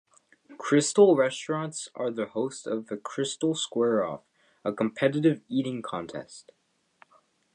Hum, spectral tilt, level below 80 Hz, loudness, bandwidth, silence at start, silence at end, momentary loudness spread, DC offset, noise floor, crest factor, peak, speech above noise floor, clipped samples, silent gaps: none; -5 dB/octave; -74 dBFS; -27 LUFS; 10 kHz; 0.5 s; 1.15 s; 15 LU; under 0.1%; -65 dBFS; 20 dB; -8 dBFS; 38 dB; under 0.1%; none